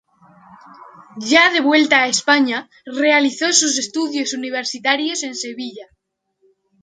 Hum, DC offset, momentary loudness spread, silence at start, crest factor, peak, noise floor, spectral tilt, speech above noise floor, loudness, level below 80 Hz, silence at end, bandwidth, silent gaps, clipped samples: none; under 0.1%; 14 LU; 0.5 s; 18 dB; 0 dBFS; -70 dBFS; -0.5 dB/octave; 52 dB; -16 LUFS; -68 dBFS; 1 s; 9.6 kHz; none; under 0.1%